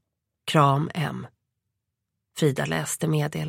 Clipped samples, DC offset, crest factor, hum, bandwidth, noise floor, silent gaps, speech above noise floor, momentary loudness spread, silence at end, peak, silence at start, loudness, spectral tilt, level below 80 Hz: under 0.1%; under 0.1%; 22 dB; none; 16.5 kHz; -82 dBFS; none; 58 dB; 18 LU; 0 s; -4 dBFS; 0.45 s; -24 LUFS; -5.5 dB/octave; -62 dBFS